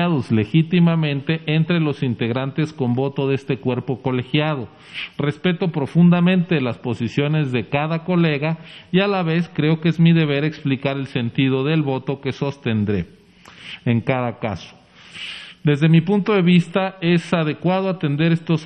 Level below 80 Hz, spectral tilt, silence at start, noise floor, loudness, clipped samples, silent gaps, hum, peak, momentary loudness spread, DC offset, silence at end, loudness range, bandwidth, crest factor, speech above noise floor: -56 dBFS; -8 dB/octave; 0 s; -44 dBFS; -19 LUFS; under 0.1%; none; none; -2 dBFS; 10 LU; under 0.1%; 0 s; 4 LU; 8.6 kHz; 16 dB; 26 dB